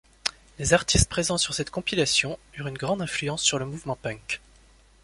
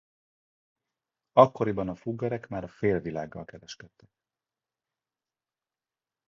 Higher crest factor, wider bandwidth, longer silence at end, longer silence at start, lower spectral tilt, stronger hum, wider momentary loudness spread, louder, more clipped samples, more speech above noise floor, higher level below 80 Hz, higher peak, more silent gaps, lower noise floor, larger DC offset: about the same, 26 dB vs 28 dB; first, 11.5 kHz vs 7.2 kHz; second, 0.65 s vs 2.45 s; second, 0.25 s vs 1.35 s; second, -3 dB/octave vs -7.5 dB/octave; neither; second, 11 LU vs 22 LU; about the same, -25 LUFS vs -27 LUFS; neither; second, 30 dB vs over 62 dB; first, -40 dBFS vs -60 dBFS; about the same, -2 dBFS vs -4 dBFS; neither; second, -56 dBFS vs under -90 dBFS; neither